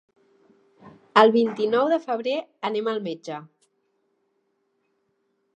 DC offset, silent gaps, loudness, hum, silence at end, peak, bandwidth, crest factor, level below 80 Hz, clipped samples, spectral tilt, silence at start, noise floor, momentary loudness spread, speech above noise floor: under 0.1%; none; -22 LUFS; none; 2.15 s; -2 dBFS; 8.8 kHz; 24 dB; -82 dBFS; under 0.1%; -5.5 dB/octave; 0.85 s; -72 dBFS; 16 LU; 50 dB